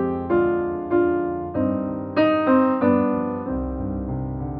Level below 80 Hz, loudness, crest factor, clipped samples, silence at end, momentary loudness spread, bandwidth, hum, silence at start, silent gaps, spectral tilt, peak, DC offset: -40 dBFS; -22 LUFS; 14 dB; under 0.1%; 0 s; 10 LU; 5.2 kHz; none; 0 s; none; -7 dB/octave; -6 dBFS; under 0.1%